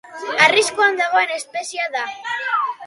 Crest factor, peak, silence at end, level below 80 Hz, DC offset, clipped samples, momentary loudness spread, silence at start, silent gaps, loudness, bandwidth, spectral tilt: 18 dB; 0 dBFS; 0 s; -68 dBFS; under 0.1%; under 0.1%; 12 LU; 0.05 s; none; -18 LUFS; 11.5 kHz; -1 dB/octave